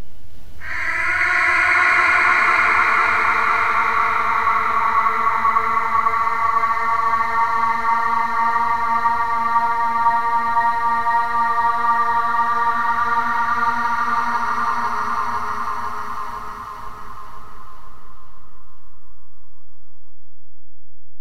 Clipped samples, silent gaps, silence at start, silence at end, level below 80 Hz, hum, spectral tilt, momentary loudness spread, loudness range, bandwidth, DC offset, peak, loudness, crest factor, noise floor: under 0.1%; none; 0 s; 0 s; -48 dBFS; none; -3 dB/octave; 12 LU; 11 LU; 16 kHz; under 0.1%; -4 dBFS; -18 LUFS; 14 dB; -59 dBFS